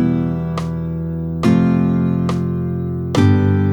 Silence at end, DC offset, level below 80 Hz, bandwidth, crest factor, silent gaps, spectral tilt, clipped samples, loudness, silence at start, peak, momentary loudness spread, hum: 0 s; under 0.1%; -38 dBFS; 10 kHz; 16 dB; none; -8.5 dB/octave; under 0.1%; -17 LUFS; 0 s; -2 dBFS; 9 LU; none